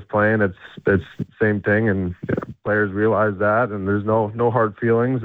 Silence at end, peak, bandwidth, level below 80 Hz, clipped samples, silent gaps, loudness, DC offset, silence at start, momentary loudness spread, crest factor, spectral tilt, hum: 0 s; -6 dBFS; 4.4 kHz; -52 dBFS; under 0.1%; none; -20 LUFS; under 0.1%; 0 s; 7 LU; 14 dB; -10.5 dB/octave; none